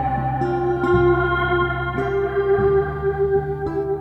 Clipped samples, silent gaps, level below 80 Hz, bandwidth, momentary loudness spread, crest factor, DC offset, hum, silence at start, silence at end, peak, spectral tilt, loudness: under 0.1%; none; -34 dBFS; 6 kHz; 6 LU; 12 dB; under 0.1%; none; 0 s; 0 s; -6 dBFS; -9 dB/octave; -20 LUFS